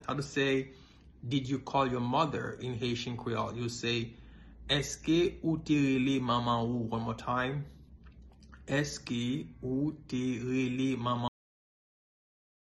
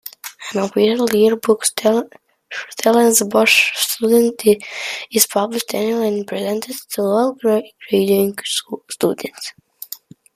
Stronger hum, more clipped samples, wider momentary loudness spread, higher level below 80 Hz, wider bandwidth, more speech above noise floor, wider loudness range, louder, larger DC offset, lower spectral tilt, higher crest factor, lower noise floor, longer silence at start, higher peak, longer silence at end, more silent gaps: neither; neither; second, 8 LU vs 18 LU; first, -56 dBFS vs -64 dBFS; second, 12 kHz vs 15.5 kHz; about the same, 22 dB vs 21 dB; about the same, 5 LU vs 4 LU; second, -32 LUFS vs -17 LUFS; neither; first, -5.5 dB/octave vs -3 dB/octave; about the same, 20 dB vs 18 dB; first, -54 dBFS vs -38 dBFS; about the same, 0 s vs 0.05 s; second, -14 dBFS vs 0 dBFS; first, 1.35 s vs 0.4 s; neither